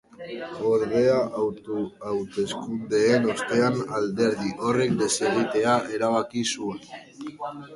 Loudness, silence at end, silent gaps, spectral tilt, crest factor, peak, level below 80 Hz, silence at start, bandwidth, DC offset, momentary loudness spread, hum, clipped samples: -25 LUFS; 0 s; none; -4.5 dB/octave; 18 dB; -8 dBFS; -62 dBFS; 0.2 s; 11.5 kHz; under 0.1%; 14 LU; none; under 0.1%